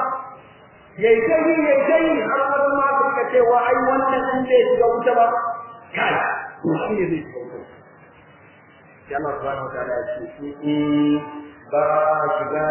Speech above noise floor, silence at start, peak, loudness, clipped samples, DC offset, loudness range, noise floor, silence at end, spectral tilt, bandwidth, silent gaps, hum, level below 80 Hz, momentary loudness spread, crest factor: 29 dB; 0 s; -4 dBFS; -19 LUFS; under 0.1%; under 0.1%; 11 LU; -48 dBFS; 0 s; -9.5 dB/octave; 3.2 kHz; none; none; -56 dBFS; 14 LU; 16 dB